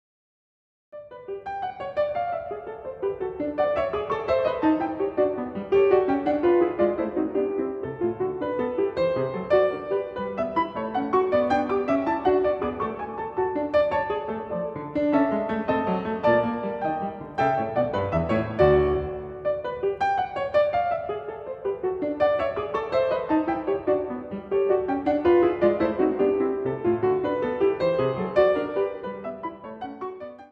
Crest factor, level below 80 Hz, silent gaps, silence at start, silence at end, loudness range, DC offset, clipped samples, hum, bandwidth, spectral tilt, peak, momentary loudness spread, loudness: 18 dB; -50 dBFS; none; 0.95 s; 0.05 s; 3 LU; under 0.1%; under 0.1%; none; 6 kHz; -8.5 dB/octave; -6 dBFS; 11 LU; -25 LUFS